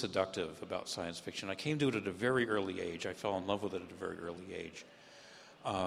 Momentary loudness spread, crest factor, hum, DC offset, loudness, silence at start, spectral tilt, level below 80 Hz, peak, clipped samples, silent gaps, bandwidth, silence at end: 17 LU; 22 dB; none; under 0.1%; -38 LUFS; 0 s; -5 dB/octave; -70 dBFS; -16 dBFS; under 0.1%; none; 15 kHz; 0 s